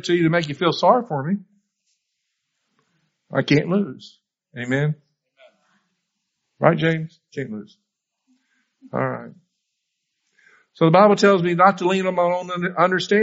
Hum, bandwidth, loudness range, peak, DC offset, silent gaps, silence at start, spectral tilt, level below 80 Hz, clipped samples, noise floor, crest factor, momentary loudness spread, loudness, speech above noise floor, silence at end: none; 8 kHz; 10 LU; 0 dBFS; under 0.1%; none; 0.05 s; -5 dB/octave; -64 dBFS; under 0.1%; -77 dBFS; 22 dB; 18 LU; -19 LUFS; 58 dB; 0 s